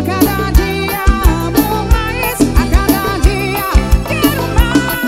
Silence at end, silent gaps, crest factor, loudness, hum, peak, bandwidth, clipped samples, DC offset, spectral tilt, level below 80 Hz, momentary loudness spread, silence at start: 0 s; none; 12 dB; -13 LUFS; none; 0 dBFS; 16.5 kHz; 0.3%; under 0.1%; -5.5 dB/octave; -16 dBFS; 2 LU; 0 s